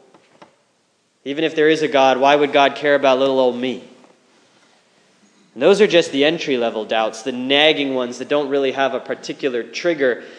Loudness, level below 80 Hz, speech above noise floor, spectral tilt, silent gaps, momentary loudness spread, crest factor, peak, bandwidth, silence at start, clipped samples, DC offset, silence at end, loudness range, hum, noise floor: -17 LUFS; -78 dBFS; 46 dB; -4 dB/octave; none; 11 LU; 18 dB; 0 dBFS; 10 kHz; 1.25 s; under 0.1%; under 0.1%; 0.05 s; 3 LU; none; -63 dBFS